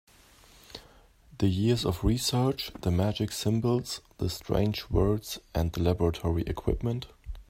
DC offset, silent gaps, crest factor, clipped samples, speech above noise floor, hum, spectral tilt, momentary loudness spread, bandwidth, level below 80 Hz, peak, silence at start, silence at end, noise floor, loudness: under 0.1%; none; 18 dB; under 0.1%; 29 dB; none; -6 dB/octave; 10 LU; 16 kHz; -42 dBFS; -10 dBFS; 0.7 s; 0.1 s; -57 dBFS; -29 LUFS